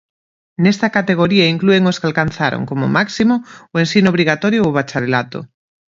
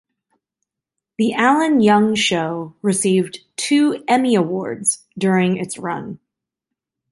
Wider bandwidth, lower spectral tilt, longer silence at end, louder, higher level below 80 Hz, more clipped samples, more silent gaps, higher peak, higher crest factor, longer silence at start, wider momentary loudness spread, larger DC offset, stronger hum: second, 7.6 kHz vs 11.5 kHz; first, -6 dB/octave vs -4.5 dB/octave; second, 0.5 s vs 0.95 s; first, -15 LUFS vs -18 LUFS; first, -50 dBFS vs -62 dBFS; neither; neither; about the same, 0 dBFS vs -2 dBFS; about the same, 16 dB vs 16 dB; second, 0.6 s vs 1.2 s; second, 7 LU vs 11 LU; neither; neither